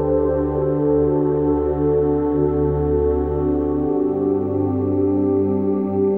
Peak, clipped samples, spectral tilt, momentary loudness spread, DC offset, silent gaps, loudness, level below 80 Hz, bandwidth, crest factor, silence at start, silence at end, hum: -8 dBFS; under 0.1%; -13 dB/octave; 2 LU; 0.3%; none; -19 LUFS; -32 dBFS; 3.1 kHz; 10 dB; 0 s; 0 s; none